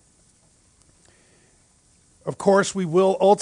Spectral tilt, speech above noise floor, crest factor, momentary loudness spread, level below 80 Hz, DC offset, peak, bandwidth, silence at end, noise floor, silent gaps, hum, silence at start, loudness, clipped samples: -5.5 dB/octave; 40 dB; 20 dB; 16 LU; -64 dBFS; under 0.1%; -4 dBFS; 10.5 kHz; 0 s; -59 dBFS; none; none; 2.25 s; -20 LUFS; under 0.1%